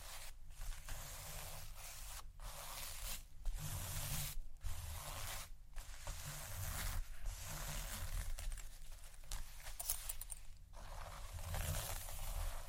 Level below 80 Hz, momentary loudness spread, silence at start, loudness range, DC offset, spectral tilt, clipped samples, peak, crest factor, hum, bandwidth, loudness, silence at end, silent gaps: -48 dBFS; 11 LU; 0 s; 2 LU; under 0.1%; -2.5 dB/octave; under 0.1%; -18 dBFS; 26 dB; none; 16.5 kHz; -48 LUFS; 0 s; none